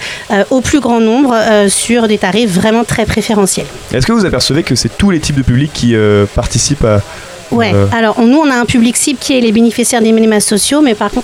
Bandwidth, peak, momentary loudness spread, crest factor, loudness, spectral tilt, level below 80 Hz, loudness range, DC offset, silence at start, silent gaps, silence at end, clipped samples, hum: 16 kHz; 0 dBFS; 4 LU; 10 dB; -10 LUFS; -4.5 dB/octave; -28 dBFS; 2 LU; under 0.1%; 0 s; none; 0 s; under 0.1%; none